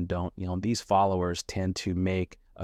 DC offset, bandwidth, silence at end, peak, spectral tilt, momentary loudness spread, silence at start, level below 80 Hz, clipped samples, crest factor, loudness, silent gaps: under 0.1%; 14.5 kHz; 0 s; -12 dBFS; -6 dB/octave; 8 LU; 0 s; -50 dBFS; under 0.1%; 18 dB; -29 LUFS; none